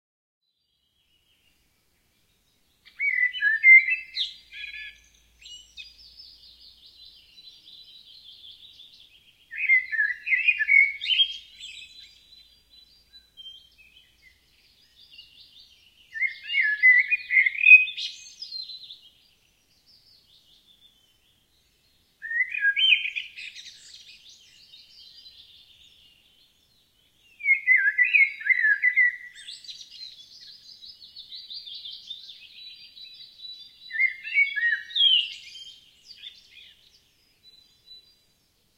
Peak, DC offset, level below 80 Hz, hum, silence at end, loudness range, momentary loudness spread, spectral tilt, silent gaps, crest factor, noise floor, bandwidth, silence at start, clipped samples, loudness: -4 dBFS; under 0.1%; -72 dBFS; none; 2.5 s; 21 LU; 27 LU; 3 dB/octave; none; 24 dB; -74 dBFS; 13 kHz; 3 s; under 0.1%; -19 LUFS